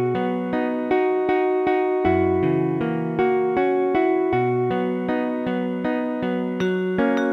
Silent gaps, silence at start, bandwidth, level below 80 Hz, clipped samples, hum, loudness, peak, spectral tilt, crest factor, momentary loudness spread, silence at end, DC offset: none; 0 s; 6.2 kHz; -54 dBFS; under 0.1%; none; -22 LUFS; -6 dBFS; -8.5 dB/octave; 14 dB; 4 LU; 0 s; under 0.1%